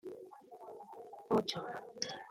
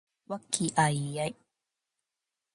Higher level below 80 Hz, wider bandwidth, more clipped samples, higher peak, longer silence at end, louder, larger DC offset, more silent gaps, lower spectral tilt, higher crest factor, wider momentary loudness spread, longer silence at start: second, -76 dBFS vs -70 dBFS; first, 16 kHz vs 11.5 kHz; neither; second, -20 dBFS vs -12 dBFS; second, 0 s vs 1.25 s; second, -38 LUFS vs -30 LUFS; neither; neither; about the same, -4 dB/octave vs -4 dB/octave; about the same, 22 dB vs 22 dB; first, 19 LU vs 14 LU; second, 0.05 s vs 0.3 s